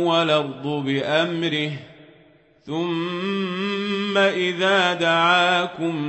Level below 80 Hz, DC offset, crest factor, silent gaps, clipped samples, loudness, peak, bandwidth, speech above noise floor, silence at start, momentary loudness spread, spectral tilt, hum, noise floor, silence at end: -68 dBFS; under 0.1%; 16 dB; none; under 0.1%; -21 LUFS; -4 dBFS; 8.4 kHz; 33 dB; 0 s; 10 LU; -5 dB/octave; none; -54 dBFS; 0 s